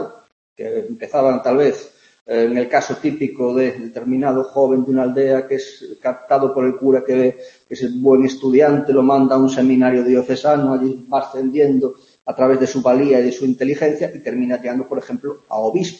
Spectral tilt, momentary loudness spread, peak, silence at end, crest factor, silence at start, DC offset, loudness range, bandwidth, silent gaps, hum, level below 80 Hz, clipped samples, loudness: -6.5 dB/octave; 11 LU; -2 dBFS; 0.05 s; 14 dB; 0 s; under 0.1%; 4 LU; 7.4 kHz; 0.32-0.56 s, 2.21-2.26 s; none; -64 dBFS; under 0.1%; -17 LUFS